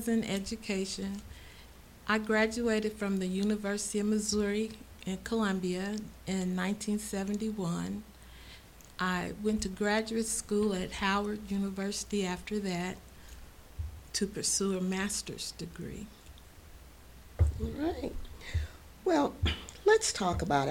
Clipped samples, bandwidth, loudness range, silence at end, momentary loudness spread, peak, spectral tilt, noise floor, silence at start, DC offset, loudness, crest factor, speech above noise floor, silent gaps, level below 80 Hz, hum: under 0.1%; 17 kHz; 5 LU; 0 s; 19 LU; -12 dBFS; -4.5 dB/octave; -53 dBFS; 0 s; under 0.1%; -33 LUFS; 20 dB; 21 dB; none; -46 dBFS; none